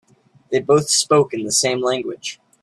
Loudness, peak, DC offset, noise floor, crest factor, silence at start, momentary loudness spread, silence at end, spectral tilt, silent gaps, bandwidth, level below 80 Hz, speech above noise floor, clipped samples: -18 LUFS; -2 dBFS; under 0.1%; -40 dBFS; 18 dB; 0.5 s; 13 LU; 0.3 s; -3 dB/octave; none; 14 kHz; -60 dBFS; 22 dB; under 0.1%